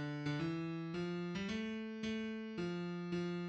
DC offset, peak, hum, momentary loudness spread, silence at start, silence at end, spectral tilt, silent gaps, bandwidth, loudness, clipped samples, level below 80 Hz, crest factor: under 0.1%; -28 dBFS; none; 3 LU; 0 s; 0 s; -6.5 dB/octave; none; 8.4 kHz; -42 LUFS; under 0.1%; -70 dBFS; 14 dB